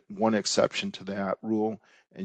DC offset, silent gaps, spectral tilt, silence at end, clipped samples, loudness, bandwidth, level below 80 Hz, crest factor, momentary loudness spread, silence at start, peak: under 0.1%; none; -4 dB/octave; 0 s; under 0.1%; -28 LUFS; 9.2 kHz; -68 dBFS; 20 dB; 9 LU; 0.1 s; -8 dBFS